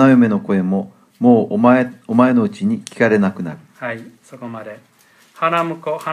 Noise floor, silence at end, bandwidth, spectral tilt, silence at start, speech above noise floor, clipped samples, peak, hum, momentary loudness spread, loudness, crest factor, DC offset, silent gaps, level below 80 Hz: -47 dBFS; 0 s; 10.5 kHz; -7.5 dB/octave; 0 s; 32 dB; under 0.1%; 0 dBFS; none; 18 LU; -16 LUFS; 16 dB; under 0.1%; none; -64 dBFS